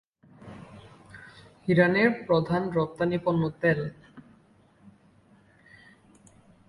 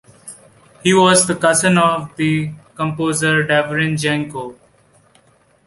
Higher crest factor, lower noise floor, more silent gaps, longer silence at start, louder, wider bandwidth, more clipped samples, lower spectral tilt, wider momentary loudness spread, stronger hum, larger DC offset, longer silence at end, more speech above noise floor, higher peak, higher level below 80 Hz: about the same, 20 dB vs 18 dB; first, -60 dBFS vs -55 dBFS; neither; first, 0.45 s vs 0.25 s; second, -25 LUFS vs -16 LUFS; about the same, 11 kHz vs 12 kHz; neither; first, -8 dB/octave vs -4 dB/octave; first, 26 LU vs 17 LU; neither; neither; first, 2.5 s vs 1.15 s; second, 35 dB vs 39 dB; second, -8 dBFS vs 0 dBFS; second, -60 dBFS vs -54 dBFS